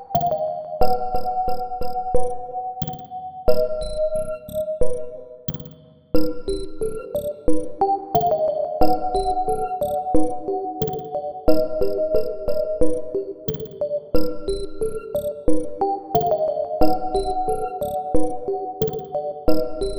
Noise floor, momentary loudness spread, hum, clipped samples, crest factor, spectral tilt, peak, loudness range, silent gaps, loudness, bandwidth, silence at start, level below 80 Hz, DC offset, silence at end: -44 dBFS; 8 LU; none; under 0.1%; 18 dB; -7 dB/octave; -2 dBFS; 4 LU; none; -24 LUFS; over 20 kHz; 0 s; -36 dBFS; under 0.1%; 0 s